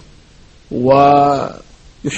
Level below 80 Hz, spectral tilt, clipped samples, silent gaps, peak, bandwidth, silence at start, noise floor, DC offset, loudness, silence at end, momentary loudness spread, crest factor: -44 dBFS; -6.5 dB/octave; under 0.1%; none; 0 dBFS; 8.6 kHz; 0.7 s; -44 dBFS; under 0.1%; -12 LUFS; 0 s; 17 LU; 16 dB